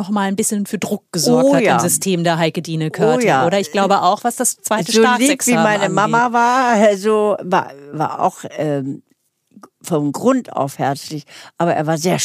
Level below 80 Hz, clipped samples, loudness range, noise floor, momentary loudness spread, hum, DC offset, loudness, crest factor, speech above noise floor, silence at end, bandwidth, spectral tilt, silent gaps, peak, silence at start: -70 dBFS; under 0.1%; 7 LU; -60 dBFS; 10 LU; none; under 0.1%; -16 LUFS; 14 dB; 44 dB; 0 s; 15.5 kHz; -4 dB/octave; none; -2 dBFS; 0 s